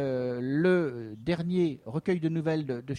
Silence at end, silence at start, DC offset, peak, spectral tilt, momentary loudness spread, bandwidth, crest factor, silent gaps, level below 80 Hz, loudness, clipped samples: 0 s; 0 s; under 0.1%; -14 dBFS; -8.5 dB/octave; 8 LU; 9.8 kHz; 16 dB; none; -62 dBFS; -29 LUFS; under 0.1%